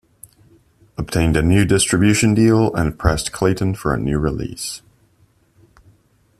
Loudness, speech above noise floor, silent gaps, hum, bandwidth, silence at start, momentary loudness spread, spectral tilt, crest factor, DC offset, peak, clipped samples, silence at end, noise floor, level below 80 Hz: -17 LUFS; 41 dB; none; none; 14.5 kHz; 1 s; 13 LU; -5.5 dB/octave; 16 dB; under 0.1%; -2 dBFS; under 0.1%; 1.6 s; -57 dBFS; -34 dBFS